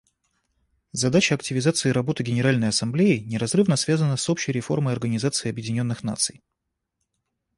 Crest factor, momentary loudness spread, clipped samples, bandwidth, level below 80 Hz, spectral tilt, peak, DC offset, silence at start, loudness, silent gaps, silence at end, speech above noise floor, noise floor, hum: 18 dB; 6 LU; under 0.1%; 11.5 kHz; -58 dBFS; -5 dB/octave; -6 dBFS; under 0.1%; 0.95 s; -23 LUFS; none; 1.25 s; 56 dB; -79 dBFS; none